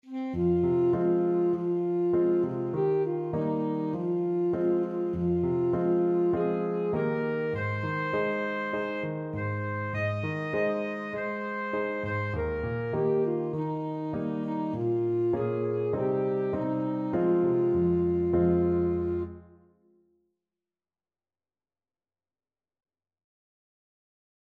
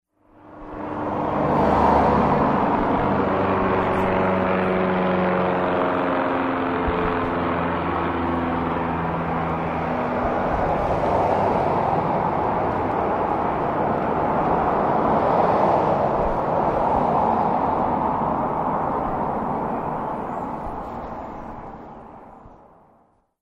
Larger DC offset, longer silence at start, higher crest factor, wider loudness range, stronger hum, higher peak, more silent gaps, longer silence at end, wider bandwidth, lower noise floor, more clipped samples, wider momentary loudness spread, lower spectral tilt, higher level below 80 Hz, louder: neither; second, 0.05 s vs 0.45 s; about the same, 14 dB vs 16 dB; about the same, 4 LU vs 6 LU; neither; second, -14 dBFS vs -6 dBFS; neither; first, 5 s vs 0.85 s; second, 4.6 kHz vs 9.6 kHz; first, under -90 dBFS vs -60 dBFS; neither; second, 7 LU vs 10 LU; first, -10 dB/octave vs -8.5 dB/octave; second, -54 dBFS vs -40 dBFS; second, -28 LUFS vs -22 LUFS